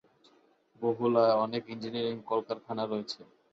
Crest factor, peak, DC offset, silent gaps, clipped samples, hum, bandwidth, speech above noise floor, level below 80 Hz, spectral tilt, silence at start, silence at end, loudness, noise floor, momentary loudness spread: 20 dB; -12 dBFS; under 0.1%; none; under 0.1%; none; 7.8 kHz; 35 dB; -76 dBFS; -6.5 dB/octave; 0.8 s; 0.3 s; -31 LUFS; -65 dBFS; 12 LU